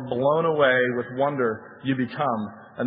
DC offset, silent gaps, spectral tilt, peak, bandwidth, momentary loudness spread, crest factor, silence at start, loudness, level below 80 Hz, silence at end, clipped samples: under 0.1%; none; -10.5 dB/octave; -6 dBFS; 5 kHz; 10 LU; 18 dB; 0 s; -24 LUFS; -68 dBFS; 0 s; under 0.1%